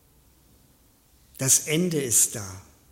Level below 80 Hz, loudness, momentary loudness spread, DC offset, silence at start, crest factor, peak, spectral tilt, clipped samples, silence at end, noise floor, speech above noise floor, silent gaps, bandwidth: -62 dBFS; -21 LUFS; 14 LU; under 0.1%; 1.4 s; 22 dB; -6 dBFS; -2.5 dB/octave; under 0.1%; 0.3 s; -60 dBFS; 36 dB; none; 16.5 kHz